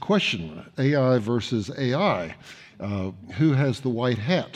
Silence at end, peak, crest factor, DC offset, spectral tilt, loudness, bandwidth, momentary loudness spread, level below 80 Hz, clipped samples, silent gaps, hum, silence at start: 0 s; -10 dBFS; 14 dB; under 0.1%; -6.5 dB/octave; -24 LUFS; 10 kHz; 14 LU; -60 dBFS; under 0.1%; none; none; 0 s